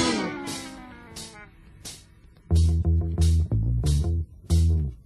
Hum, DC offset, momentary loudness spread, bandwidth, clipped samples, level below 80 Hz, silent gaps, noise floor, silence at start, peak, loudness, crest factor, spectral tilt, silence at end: none; under 0.1%; 19 LU; 12.5 kHz; under 0.1%; -30 dBFS; none; -52 dBFS; 0 s; -10 dBFS; -25 LUFS; 14 dB; -6 dB/octave; 0.1 s